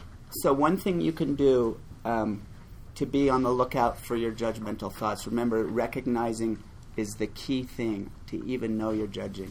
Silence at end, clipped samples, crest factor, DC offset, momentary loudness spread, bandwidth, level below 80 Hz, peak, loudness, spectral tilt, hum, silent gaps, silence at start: 0 s; under 0.1%; 18 dB; under 0.1%; 12 LU; 19.5 kHz; -48 dBFS; -10 dBFS; -29 LUFS; -6 dB/octave; none; none; 0 s